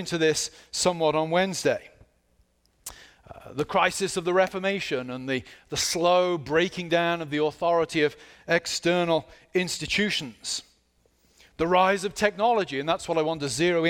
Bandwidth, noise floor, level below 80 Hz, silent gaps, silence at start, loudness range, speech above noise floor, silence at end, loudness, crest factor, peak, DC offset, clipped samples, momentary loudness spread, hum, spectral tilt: 18 kHz; -66 dBFS; -58 dBFS; none; 0 s; 3 LU; 41 dB; 0 s; -25 LUFS; 20 dB; -6 dBFS; under 0.1%; under 0.1%; 9 LU; none; -3.5 dB/octave